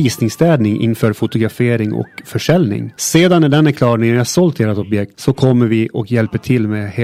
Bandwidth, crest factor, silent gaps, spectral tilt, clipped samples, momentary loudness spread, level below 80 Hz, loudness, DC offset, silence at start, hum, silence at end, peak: 15.5 kHz; 14 dB; none; -6 dB/octave; under 0.1%; 8 LU; -48 dBFS; -14 LUFS; under 0.1%; 0 s; none; 0 s; 0 dBFS